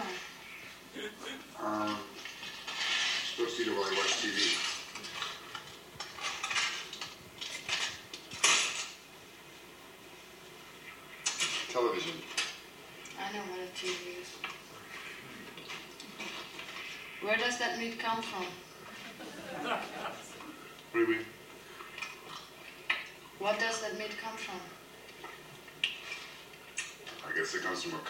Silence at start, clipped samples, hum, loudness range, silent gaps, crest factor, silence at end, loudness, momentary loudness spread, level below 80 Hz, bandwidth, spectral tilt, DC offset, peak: 0 s; under 0.1%; none; 8 LU; none; 26 dB; 0 s; -35 LUFS; 19 LU; -72 dBFS; 16.5 kHz; -1 dB/octave; under 0.1%; -10 dBFS